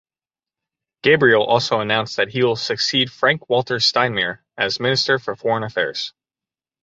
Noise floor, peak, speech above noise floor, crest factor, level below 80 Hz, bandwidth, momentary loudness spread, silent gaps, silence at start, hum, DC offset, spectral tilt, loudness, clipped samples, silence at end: under -90 dBFS; -2 dBFS; over 71 dB; 18 dB; -60 dBFS; 8 kHz; 8 LU; none; 1.05 s; none; under 0.1%; -4 dB/octave; -18 LUFS; under 0.1%; 0.75 s